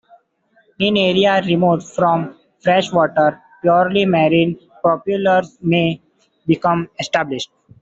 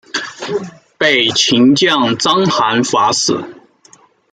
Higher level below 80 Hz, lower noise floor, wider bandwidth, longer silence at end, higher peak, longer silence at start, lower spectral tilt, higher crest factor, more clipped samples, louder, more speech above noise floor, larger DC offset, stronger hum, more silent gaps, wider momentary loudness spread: about the same, -56 dBFS vs -58 dBFS; first, -59 dBFS vs -47 dBFS; second, 7.8 kHz vs 9.6 kHz; second, 0.35 s vs 0.8 s; about the same, 0 dBFS vs 0 dBFS; first, 0.8 s vs 0.15 s; first, -6 dB/octave vs -3 dB/octave; about the same, 16 dB vs 14 dB; neither; second, -17 LUFS vs -13 LUFS; first, 43 dB vs 35 dB; neither; neither; neither; second, 8 LU vs 12 LU